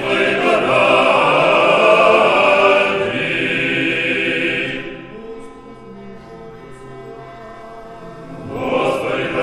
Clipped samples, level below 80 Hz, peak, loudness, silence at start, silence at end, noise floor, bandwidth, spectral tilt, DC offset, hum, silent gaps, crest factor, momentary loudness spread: under 0.1%; -50 dBFS; 0 dBFS; -14 LUFS; 0 s; 0 s; -36 dBFS; 11.5 kHz; -4.5 dB/octave; under 0.1%; none; none; 16 dB; 24 LU